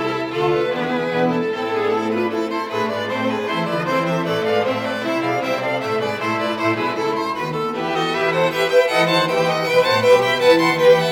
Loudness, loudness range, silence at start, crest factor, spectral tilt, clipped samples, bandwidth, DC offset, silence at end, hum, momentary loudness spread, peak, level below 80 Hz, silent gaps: -19 LUFS; 5 LU; 0 s; 16 dB; -5 dB/octave; under 0.1%; 17.5 kHz; under 0.1%; 0 s; none; 8 LU; -2 dBFS; -62 dBFS; none